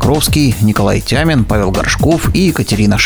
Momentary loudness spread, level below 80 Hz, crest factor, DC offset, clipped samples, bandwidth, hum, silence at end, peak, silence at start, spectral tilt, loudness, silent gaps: 2 LU; -24 dBFS; 12 dB; under 0.1%; under 0.1%; over 20 kHz; none; 0 s; 0 dBFS; 0 s; -5 dB/octave; -12 LUFS; none